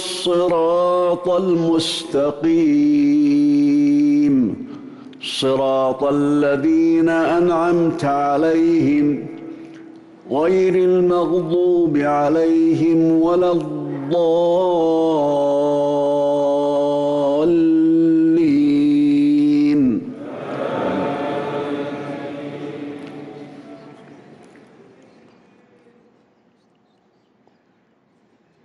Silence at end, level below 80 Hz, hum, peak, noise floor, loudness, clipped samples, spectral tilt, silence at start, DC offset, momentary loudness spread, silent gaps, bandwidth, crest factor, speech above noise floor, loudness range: 4.5 s; -56 dBFS; none; -10 dBFS; -59 dBFS; -17 LUFS; under 0.1%; -6.5 dB/octave; 0 s; under 0.1%; 15 LU; none; 11.5 kHz; 8 dB; 43 dB; 10 LU